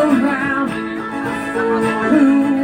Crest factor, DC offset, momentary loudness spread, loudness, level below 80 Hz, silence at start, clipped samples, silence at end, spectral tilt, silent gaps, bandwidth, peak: 14 dB; under 0.1%; 10 LU; -17 LUFS; -50 dBFS; 0 s; under 0.1%; 0 s; -6 dB/octave; none; 11 kHz; -2 dBFS